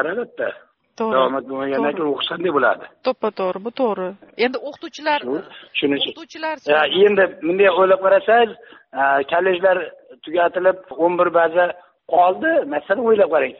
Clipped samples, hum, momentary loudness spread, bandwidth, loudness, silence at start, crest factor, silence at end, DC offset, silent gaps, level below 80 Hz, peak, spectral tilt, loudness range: under 0.1%; none; 12 LU; 6.4 kHz; -19 LUFS; 0 s; 16 dB; 0.05 s; under 0.1%; none; -66 dBFS; -4 dBFS; -1.5 dB/octave; 6 LU